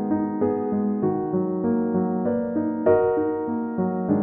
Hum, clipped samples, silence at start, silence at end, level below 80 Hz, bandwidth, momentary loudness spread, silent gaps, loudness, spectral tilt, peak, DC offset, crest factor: none; under 0.1%; 0 s; 0 s; -58 dBFS; 3 kHz; 5 LU; none; -23 LUFS; -14 dB/octave; -6 dBFS; under 0.1%; 16 dB